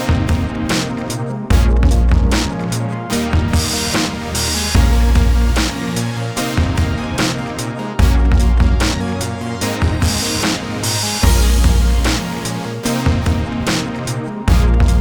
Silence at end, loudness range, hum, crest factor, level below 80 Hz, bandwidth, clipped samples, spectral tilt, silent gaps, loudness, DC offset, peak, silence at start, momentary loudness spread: 0 s; 1 LU; none; 14 dB; -18 dBFS; over 20 kHz; under 0.1%; -5 dB/octave; none; -17 LUFS; under 0.1%; 0 dBFS; 0 s; 8 LU